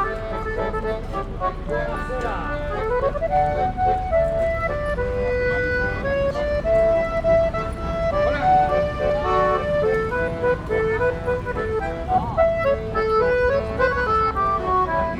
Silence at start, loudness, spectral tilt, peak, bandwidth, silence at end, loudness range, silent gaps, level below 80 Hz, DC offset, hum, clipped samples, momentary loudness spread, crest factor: 0 s; -22 LUFS; -7 dB/octave; -8 dBFS; 11 kHz; 0 s; 3 LU; none; -32 dBFS; under 0.1%; none; under 0.1%; 7 LU; 14 dB